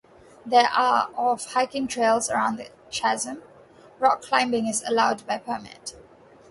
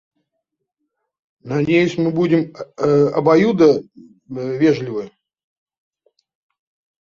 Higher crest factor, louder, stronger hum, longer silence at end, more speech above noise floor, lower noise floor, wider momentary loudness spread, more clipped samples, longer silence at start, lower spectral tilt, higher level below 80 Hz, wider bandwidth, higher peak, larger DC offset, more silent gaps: about the same, 20 dB vs 18 dB; second, -23 LUFS vs -17 LUFS; neither; second, 0.6 s vs 1.95 s; second, 27 dB vs 60 dB; second, -51 dBFS vs -77 dBFS; about the same, 15 LU vs 14 LU; neither; second, 0.45 s vs 1.45 s; second, -2.5 dB/octave vs -7.5 dB/octave; second, -64 dBFS vs -58 dBFS; first, 11.5 kHz vs 7.2 kHz; second, -4 dBFS vs 0 dBFS; neither; neither